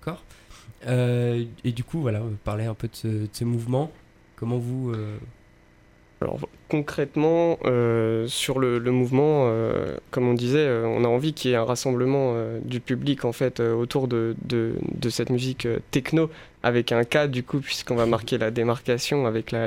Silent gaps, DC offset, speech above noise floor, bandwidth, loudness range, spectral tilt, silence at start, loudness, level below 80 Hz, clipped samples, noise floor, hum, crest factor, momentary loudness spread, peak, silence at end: none; under 0.1%; 31 dB; 16 kHz; 7 LU; -6 dB/octave; 0 s; -25 LUFS; -52 dBFS; under 0.1%; -55 dBFS; none; 20 dB; 8 LU; -4 dBFS; 0 s